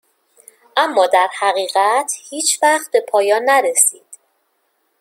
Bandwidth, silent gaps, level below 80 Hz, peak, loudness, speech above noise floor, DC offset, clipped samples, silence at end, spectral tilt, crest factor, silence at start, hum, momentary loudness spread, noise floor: 16.5 kHz; none; -78 dBFS; 0 dBFS; -15 LUFS; 50 dB; under 0.1%; under 0.1%; 0.85 s; 1 dB/octave; 18 dB; 0.75 s; none; 5 LU; -66 dBFS